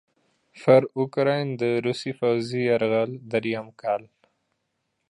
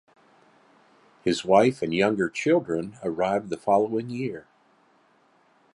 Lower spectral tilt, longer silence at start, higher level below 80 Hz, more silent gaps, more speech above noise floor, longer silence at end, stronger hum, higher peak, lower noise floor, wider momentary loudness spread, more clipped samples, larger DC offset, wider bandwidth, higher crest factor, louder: first, -7 dB/octave vs -5.5 dB/octave; second, 0.55 s vs 1.25 s; second, -72 dBFS vs -62 dBFS; neither; first, 53 dB vs 38 dB; second, 1.05 s vs 1.35 s; neither; about the same, -4 dBFS vs -6 dBFS; first, -77 dBFS vs -62 dBFS; about the same, 10 LU vs 12 LU; neither; neither; about the same, 11 kHz vs 11.5 kHz; about the same, 22 dB vs 22 dB; about the same, -24 LUFS vs -25 LUFS